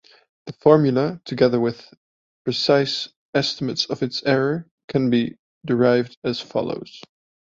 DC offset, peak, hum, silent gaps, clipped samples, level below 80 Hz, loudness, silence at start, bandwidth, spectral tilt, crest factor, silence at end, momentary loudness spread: under 0.1%; -2 dBFS; none; 1.97-2.45 s, 3.16-3.33 s, 4.71-4.78 s, 4.84-4.88 s, 5.39-5.61 s, 6.17-6.22 s; under 0.1%; -60 dBFS; -21 LUFS; 0.45 s; 7.6 kHz; -6 dB/octave; 20 dB; 0.45 s; 14 LU